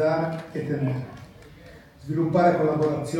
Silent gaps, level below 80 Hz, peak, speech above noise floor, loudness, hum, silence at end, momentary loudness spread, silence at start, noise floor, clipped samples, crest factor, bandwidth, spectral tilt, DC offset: none; -56 dBFS; -8 dBFS; 24 dB; -24 LUFS; none; 0 s; 19 LU; 0 s; -47 dBFS; under 0.1%; 16 dB; 15.5 kHz; -8 dB/octave; under 0.1%